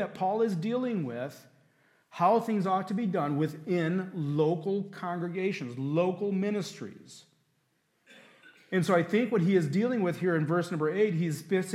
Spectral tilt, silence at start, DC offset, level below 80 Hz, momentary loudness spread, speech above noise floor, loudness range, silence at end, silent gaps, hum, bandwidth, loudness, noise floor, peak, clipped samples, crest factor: -7 dB/octave; 0 s; under 0.1%; -80 dBFS; 9 LU; 45 dB; 5 LU; 0 s; none; none; 14 kHz; -29 LUFS; -74 dBFS; -12 dBFS; under 0.1%; 18 dB